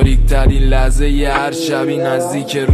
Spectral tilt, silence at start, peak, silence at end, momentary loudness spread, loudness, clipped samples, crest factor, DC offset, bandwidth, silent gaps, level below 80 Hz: -6 dB/octave; 0 s; 0 dBFS; 0 s; 4 LU; -15 LUFS; under 0.1%; 12 dB; under 0.1%; 13.5 kHz; none; -14 dBFS